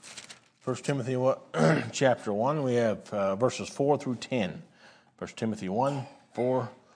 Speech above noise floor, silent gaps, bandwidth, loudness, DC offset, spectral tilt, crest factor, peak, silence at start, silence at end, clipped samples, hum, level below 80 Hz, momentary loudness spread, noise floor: 29 dB; none; 10.5 kHz; -29 LUFS; under 0.1%; -6 dB/octave; 20 dB; -10 dBFS; 0 s; 0.2 s; under 0.1%; none; -72 dBFS; 15 LU; -57 dBFS